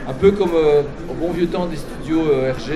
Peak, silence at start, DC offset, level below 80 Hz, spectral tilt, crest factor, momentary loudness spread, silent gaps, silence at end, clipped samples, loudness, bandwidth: -2 dBFS; 0 s; under 0.1%; -34 dBFS; -7 dB/octave; 16 dB; 11 LU; none; 0 s; under 0.1%; -18 LUFS; 13 kHz